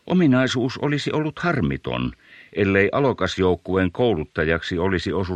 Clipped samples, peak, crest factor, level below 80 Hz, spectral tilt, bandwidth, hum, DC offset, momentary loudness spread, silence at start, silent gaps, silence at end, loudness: under 0.1%; -2 dBFS; 18 dB; -44 dBFS; -6.5 dB/octave; 9.2 kHz; none; under 0.1%; 7 LU; 0.05 s; none; 0 s; -21 LUFS